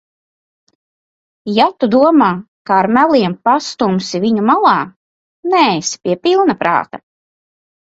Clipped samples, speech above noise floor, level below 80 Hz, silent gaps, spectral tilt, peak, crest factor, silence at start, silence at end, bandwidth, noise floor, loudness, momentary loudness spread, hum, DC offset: under 0.1%; over 77 dB; -58 dBFS; 2.48-2.65 s, 4.96-5.43 s; -5 dB/octave; 0 dBFS; 14 dB; 1.45 s; 0.95 s; 8 kHz; under -90 dBFS; -13 LUFS; 10 LU; none; under 0.1%